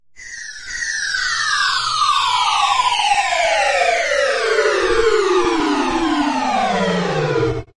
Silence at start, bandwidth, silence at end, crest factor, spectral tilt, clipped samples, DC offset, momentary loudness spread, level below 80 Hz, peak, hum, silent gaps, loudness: 0.05 s; 11.5 kHz; 0.15 s; 14 dB; -3 dB/octave; under 0.1%; under 0.1%; 5 LU; -42 dBFS; -4 dBFS; none; none; -16 LUFS